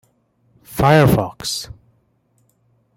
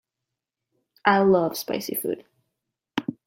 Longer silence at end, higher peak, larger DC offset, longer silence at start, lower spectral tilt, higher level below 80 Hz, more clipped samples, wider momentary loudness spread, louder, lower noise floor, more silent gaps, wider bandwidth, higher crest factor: first, 1.3 s vs 0.15 s; about the same, -2 dBFS vs -4 dBFS; neither; second, 0.7 s vs 1.05 s; about the same, -5.5 dB/octave vs -5 dB/octave; first, -40 dBFS vs -66 dBFS; neither; first, 18 LU vs 13 LU; first, -16 LUFS vs -24 LUFS; second, -62 dBFS vs -85 dBFS; neither; about the same, 16.5 kHz vs 16.5 kHz; about the same, 18 dB vs 22 dB